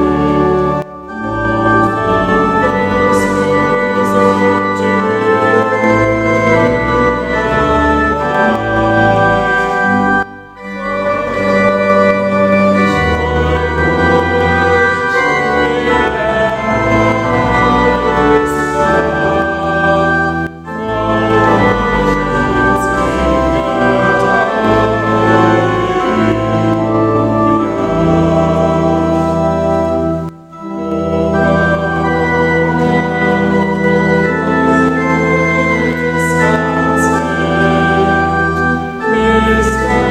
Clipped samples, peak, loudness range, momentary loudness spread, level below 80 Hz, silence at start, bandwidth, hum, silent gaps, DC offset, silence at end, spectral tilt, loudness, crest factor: under 0.1%; 0 dBFS; 1 LU; 4 LU; -30 dBFS; 0 s; 14.5 kHz; none; none; under 0.1%; 0 s; -6.5 dB/octave; -12 LUFS; 12 dB